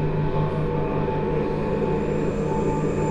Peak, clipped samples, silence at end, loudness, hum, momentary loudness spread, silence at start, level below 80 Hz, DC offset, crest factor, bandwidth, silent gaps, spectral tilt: -10 dBFS; under 0.1%; 0 s; -24 LUFS; none; 1 LU; 0 s; -34 dBFS; under 0.1%; 14 dB; 8.2 kHz; none; -8.5 dB/octave